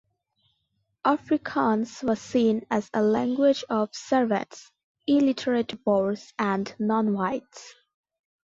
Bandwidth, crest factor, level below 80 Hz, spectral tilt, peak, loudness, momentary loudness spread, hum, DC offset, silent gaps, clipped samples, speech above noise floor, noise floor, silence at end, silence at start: 7.8 kHz; 18 dB; -66 dBFS; -6 dB/octave; -8 dBFS; -25 LUFS; 7 LU; none; under 0.1%; 4.84-4.95 s; under 0.1%; 51 dB; -75 dBFS; 0.8 s; 1.05 s